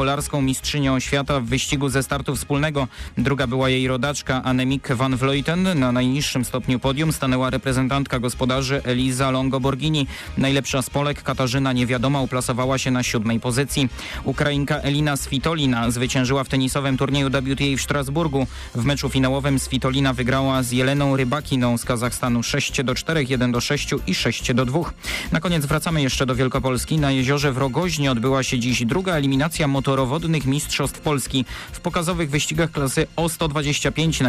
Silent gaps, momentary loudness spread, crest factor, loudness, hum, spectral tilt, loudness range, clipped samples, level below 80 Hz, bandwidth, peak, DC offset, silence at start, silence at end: none; 3 LU; 10 dB; -21 LUFS; none; -5 dB/octave; 1 LU; under 0.1%; -38 dBFS; 15.5 kHz; -12 dBFS; under 0.1%; 0 s; 0 s